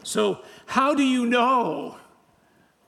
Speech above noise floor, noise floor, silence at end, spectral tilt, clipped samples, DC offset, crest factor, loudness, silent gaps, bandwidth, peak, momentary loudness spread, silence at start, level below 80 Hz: 38 dB; -61 dBFS; 0.9 s; -4 dB/octave; under 0.1%; under 0.1%; 18 dB; -22 LUFS; none; 14 kHz; -6 dBFS; 14 LU; 0.05 s; -70 dBFS